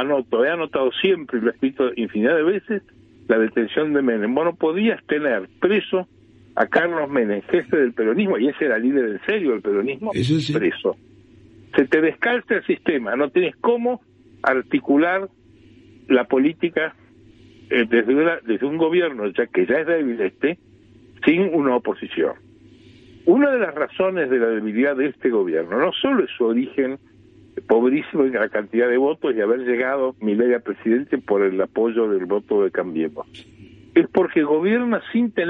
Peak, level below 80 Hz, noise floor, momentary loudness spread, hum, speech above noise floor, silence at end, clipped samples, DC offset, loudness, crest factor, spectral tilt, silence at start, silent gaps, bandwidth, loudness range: -2 dBFS; -62 dBFS; -49 dBFS; 6 LU; none; 30 dB; 0 s; under 0.1%; under 0.1%; -20 LUFS; 18 dB; -7 dB/octave; 0 s; none; 8.2 kHz; 1 LU